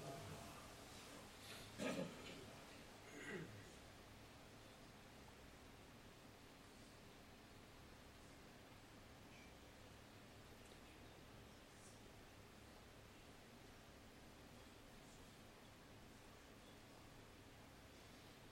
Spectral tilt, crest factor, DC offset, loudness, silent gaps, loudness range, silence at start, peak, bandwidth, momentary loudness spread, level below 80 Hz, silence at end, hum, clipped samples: -4 dB/octave; 26 dB; under 0.1%; -59 LUFS; none; 9 LU; 0 s; -34 dBFS; 16 kHz; 9 LU; -72 dBFS; 0 s; none; under 0.1%